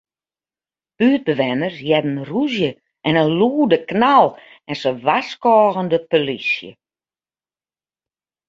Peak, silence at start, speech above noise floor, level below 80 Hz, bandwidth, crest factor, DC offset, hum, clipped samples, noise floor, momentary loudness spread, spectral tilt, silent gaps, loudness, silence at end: -2 dBFS; 1 s; over 73 dB; -62 dBFS; 7.6 kHz; 18 dB; under 0.1%; none; under 0.1%; under -90 dBFS; 9 LU; -7 dB/octave; none; -17 LUFS; 1.75 s